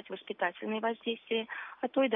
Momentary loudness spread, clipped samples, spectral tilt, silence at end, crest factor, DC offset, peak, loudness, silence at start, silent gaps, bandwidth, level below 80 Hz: 6 LU; under 0.1%; -7.5 dB/octave; 0 s; 18 dB; under 0.1%; -16 dBFS; -35 LUFS; 0.05 s; none; 3.8 kHz; -88 dBFS